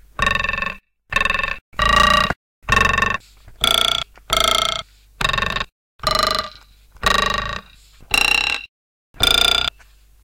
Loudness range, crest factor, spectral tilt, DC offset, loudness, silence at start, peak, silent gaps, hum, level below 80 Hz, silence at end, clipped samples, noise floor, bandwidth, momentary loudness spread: 3 LU; 16 dB; -2 dB/octave; under 0.1%; -18 LUFS; 0.2 s; -4 dBFS; 1.61-1.72 s, 2.36-2.62 s, 5.72-5.99 s, 8.69-9.14 s; none; -34 dBFS; 0.55 s; under 0.1%; -49 dBFS; 17 kHz; 13 LU